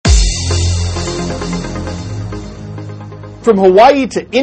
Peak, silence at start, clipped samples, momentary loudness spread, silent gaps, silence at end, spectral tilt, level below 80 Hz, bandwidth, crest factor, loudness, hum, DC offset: 0 dBFS; 0.05 s; 0.3%; 20 LU; none; 0 s; -5 dB/octave; -20 dBFS; 8.8 kHz; 12 dB; -13 LUFS; none; under 0.1%